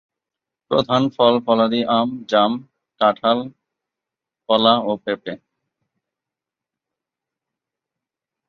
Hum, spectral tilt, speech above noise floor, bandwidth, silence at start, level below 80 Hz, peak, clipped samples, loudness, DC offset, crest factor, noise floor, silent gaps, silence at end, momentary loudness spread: none; -6.5 dB/octave; 69 dB; 6.8 kHz; 0.7 s; -64 dBFS; -2 dBFS; under 0.1%; -18 LUFS; under 0.1%; 20 dB; -87 dBFS; none; 3.1 s; 12 LU